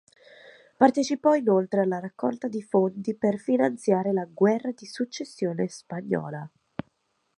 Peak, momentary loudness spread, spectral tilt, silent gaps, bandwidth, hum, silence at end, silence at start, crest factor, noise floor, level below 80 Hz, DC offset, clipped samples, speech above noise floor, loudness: -4 dBFS; 14 LU; -6.5 dB/octave; none; 11 kHz; none; 0.9 s; 0.45 s; 22 dB; -72 dBFS; -72 dBFS; under 0.1%; under 0.1%; 47 dB; -26 LUFS